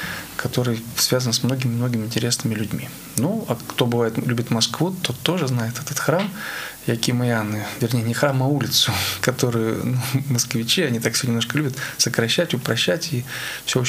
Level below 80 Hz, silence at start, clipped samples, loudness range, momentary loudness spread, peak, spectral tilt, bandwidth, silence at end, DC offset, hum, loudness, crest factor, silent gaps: -56 dBFS; 0 s; under 0.1%; 2 LU; 7 LU; 0 dBFS; -4 dB/octave; 16 kHz; 0 s; under 0.1%; none; -21 LUFS; 22 dB; none